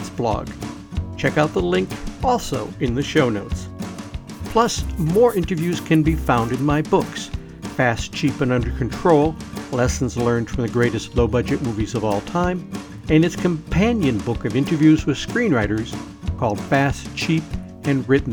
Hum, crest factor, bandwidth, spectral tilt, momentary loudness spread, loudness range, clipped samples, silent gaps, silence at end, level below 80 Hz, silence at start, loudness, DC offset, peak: none; 16 dB; 19 kHz; -6 dB/octave; 13 LU; 2 LU; under 0.1%; none; 0 s; -34 dBFS; 0 s; -20 LUFS; under 0.1%; -4 dBFS